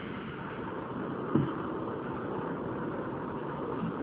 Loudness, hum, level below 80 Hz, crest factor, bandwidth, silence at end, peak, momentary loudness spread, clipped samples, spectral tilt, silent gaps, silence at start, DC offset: -36 LUFS; none; -60 dBFS; 22 dB; 4.8 kHz; 0 s; -14 dBFS; 8 LU; under 0.1%; -7 dB/octave; none; 0 s; under 0.1%